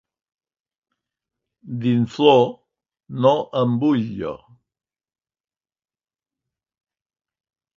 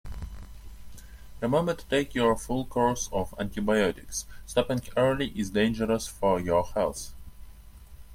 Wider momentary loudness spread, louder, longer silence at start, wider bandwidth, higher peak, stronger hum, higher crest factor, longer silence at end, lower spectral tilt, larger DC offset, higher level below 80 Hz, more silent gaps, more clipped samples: first, 17 LU vs 13 LU; first, -19 LUFS vs -28 LUFS; first, 1.65 s vs 0.05 s; second, 7.4 kHz vs 16.5 kHz; first, -2 dBFS vs -10 dBFS; neither; about the same, 22 dB vs 18 dB; first, 3.4 s vs 0 s; first, -8 dB/octave vs -5 dB/octave; neither; second, -62 dBFS vs -44 dBFS; neither; neither